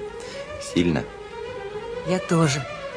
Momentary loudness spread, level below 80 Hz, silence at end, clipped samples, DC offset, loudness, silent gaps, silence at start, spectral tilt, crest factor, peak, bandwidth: 14 LU; -48 dBFS; 0 s; under 0.1%; under 0.1%; -26 LUFS; none; 0 s; -5.5 dB/octave; 18 dB; -6 dBFS; 10.5 kHz